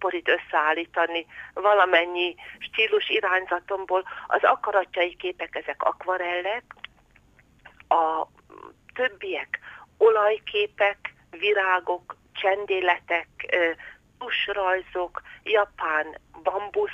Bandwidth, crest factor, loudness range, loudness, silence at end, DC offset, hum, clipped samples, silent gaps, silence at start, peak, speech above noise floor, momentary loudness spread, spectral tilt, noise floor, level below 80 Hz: 7.4 kHz; 18 dB; 5 LU; -24 LUFS; 0 s; under 0.1%; none; under 0.1%; none; 0 s; -8 dBFS; 33 dB; 14 LU; -4 dB/octave; -58 dBFS; -64 dBFS